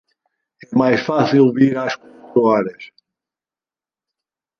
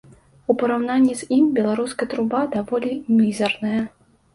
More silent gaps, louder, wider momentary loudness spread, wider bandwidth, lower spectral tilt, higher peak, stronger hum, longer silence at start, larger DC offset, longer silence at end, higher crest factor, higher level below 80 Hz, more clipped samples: neither; first, -16 LUFS vs -21 LUFS; first, 11 LU vs 6 LU; second, 6.8 kHz vs 11.5 kHz; first, -7.5 dB/octave vs -5.5 dB/octave; about the same, -2 dBFS vs -4 dBFS; neither; first, 0.7 s vs 0.5 s; neither; first, 1.75 s vs 0.45 s; about the same, 18 dB vs 18 dB; about the same, -62 dBFS vs -60 dBFS; neither